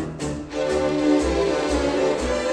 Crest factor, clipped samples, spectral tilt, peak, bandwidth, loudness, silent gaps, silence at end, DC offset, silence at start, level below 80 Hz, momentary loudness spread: 14 dB; under 0.1%; -5 dB/octave; -6 dBFS; 11 kHz; -22 LUFS; none; 0 s; under 0.1%; 0 s; -36 dBFS; 8 LU